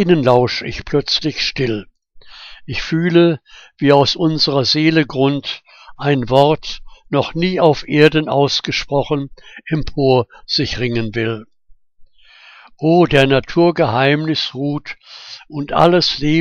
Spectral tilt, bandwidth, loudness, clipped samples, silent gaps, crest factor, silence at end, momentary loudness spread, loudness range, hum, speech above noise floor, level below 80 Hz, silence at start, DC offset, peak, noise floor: -6 dB/octave; 8.6 kHz; -15 LUFS; under 0.1%; none; 16 dB; 0 s; 14 LU; 4 LU; none; 32 dB; -40 dBFS; 0 s; under 0.1%; 0 dBFS; -47 dBFS